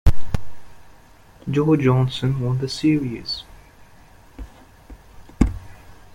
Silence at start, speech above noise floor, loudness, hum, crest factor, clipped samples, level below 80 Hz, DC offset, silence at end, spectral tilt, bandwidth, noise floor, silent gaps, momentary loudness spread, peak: 0.05 s; 28 dB; -22 LUFS; none; 20 dB; under 0.1%; -32 dBFS; under 0.1%; 0.25 s; -7 dB/octave; 14 kHz; -48 dBFS; none; 25 LU; -2 dBFS